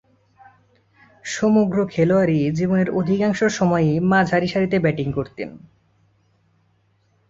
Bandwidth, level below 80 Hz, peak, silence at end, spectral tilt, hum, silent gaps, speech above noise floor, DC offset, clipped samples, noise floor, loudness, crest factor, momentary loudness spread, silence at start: 7.8 kHz; -52 dBFS; -4 dBFS; 1.7 s; -6.5 dB/octave; none; none; 44 dB; under 0.1%; under 0.1%; -62 dBFS; -19 LUFS; 16 dB; 11 LU; 1.25 s